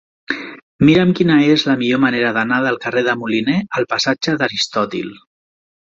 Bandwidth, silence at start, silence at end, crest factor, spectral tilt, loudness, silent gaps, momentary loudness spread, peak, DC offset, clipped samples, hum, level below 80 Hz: 7.8 kHz; 0.3 s; 0.7 s; 16 dB; -5.5 dB/octave; -16 LUFS; 0.63-0.79 s; 13 LU; 0 dBFS; under 0.1%; under 0.1%; none; -52 dBFS